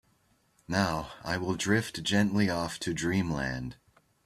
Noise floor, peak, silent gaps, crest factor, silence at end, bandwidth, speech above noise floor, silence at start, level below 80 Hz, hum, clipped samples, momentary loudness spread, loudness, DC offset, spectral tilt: -69 dBFS; -10 dBFS; none; 20 dB; 0.5 s; 14 kHz; 39 dB; 0.7 s; -54 dBFS; none; under 0.1%; 8 LU; -30 LUFS; under 0.1%; -5 dB/octave